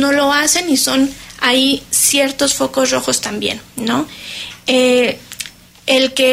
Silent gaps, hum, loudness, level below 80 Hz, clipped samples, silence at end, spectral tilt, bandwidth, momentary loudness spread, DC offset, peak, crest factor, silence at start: none; none; -14 LUFS; -50 dBFS; under 0.1%; 0 s; -1.5 dB/octave; 16 kHz; 14 LU; under 0.1%; 0 dBFS; 14 dB; 0 s